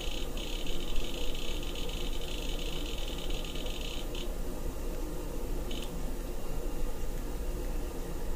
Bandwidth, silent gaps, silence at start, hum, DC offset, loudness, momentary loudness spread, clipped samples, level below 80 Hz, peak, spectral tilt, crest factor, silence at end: 16 kHz; none; 0 s; none; under 0.1%; -39 LUFS; 3 LU; under 0.1%; -36 dBFS; -16 dBFS; -4 dB/octave; 16 dB; 0 s